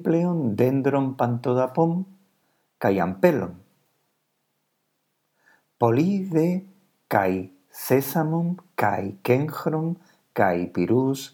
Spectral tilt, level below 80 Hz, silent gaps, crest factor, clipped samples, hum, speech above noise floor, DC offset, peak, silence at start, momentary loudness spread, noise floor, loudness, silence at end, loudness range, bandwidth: -7.5 dB/octave; -68 dBFS; none; 20 dB; under 0.1%; none; 52 dB; under 0.1%; -4 dBFS; 0 s; 10 LU; -74 dBFS; -24 LUFS; 0.05 s; 4 LU; 19.5 kHz